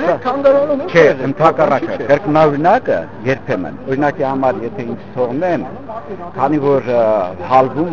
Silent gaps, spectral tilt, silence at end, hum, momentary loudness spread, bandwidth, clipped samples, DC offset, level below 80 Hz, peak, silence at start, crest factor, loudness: none; -7.5 dB/octave; 0 s; none; 12 LU; 7.2 kHz; under 0.1%; 2%; -46 dBFS; 0 dBFS; 0 s; 14 dB; -15 LUFS